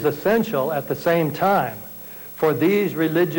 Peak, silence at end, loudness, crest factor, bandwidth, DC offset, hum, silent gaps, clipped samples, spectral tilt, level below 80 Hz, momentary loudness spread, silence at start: -10 dBFS; 0 s; -21 LUFS; 10 dB; 17 kHz; under 0.1%; 60 Hz at -50 dBFS; none; under 0.1%; -6.5 dB/octave; -56 dBFS; 14 LU; 0 s